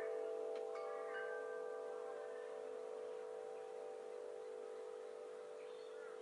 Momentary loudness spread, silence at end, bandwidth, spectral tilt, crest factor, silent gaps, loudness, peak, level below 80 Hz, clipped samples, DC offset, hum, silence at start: 7 LU; 0 s; 11 kHz; -2.5 dB/octave; 14 dB; none; -49 LUFS; -36 dBFS; under -90 dBFS; under 0.1%; under 0.1%; none; 0 s